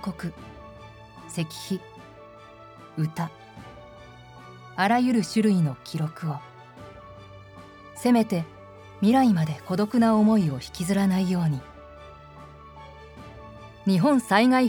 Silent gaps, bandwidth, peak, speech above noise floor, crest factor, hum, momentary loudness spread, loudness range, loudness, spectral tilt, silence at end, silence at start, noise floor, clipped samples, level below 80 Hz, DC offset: none; 19 kHz; -6 dBFS; 24 dB; 20 dB; none; 26 LU; 12 LU; -24 LUFS; -6.5 dB/octave; 0 s; 0 s; -47 dBFS; under 0.1%; -56 dBFS; under 0.1%